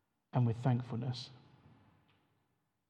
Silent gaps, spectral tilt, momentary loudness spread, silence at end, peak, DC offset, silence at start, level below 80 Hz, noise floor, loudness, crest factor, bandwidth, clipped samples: none; -8 dB/octave; 12 LU; 1.5 s; -18 dBFS; under 0.1%; 0.35 s; -78 dBFS; -81 dBFS; -36 LUFS; 20 dB; 8.2 kHz; under 0.1%